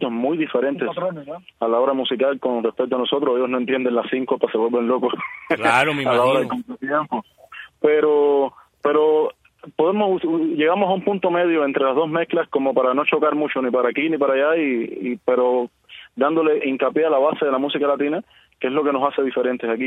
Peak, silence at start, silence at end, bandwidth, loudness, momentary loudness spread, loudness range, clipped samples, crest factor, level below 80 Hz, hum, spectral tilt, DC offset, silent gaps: -2 dBFS; 0 s; 0 s; 10.5 kHz; -20 LUFS; 9 LU; 2 LU; under 0.1%; 18 dB; -68 dBFS; none; -6 dB/octave; under 0.1%; none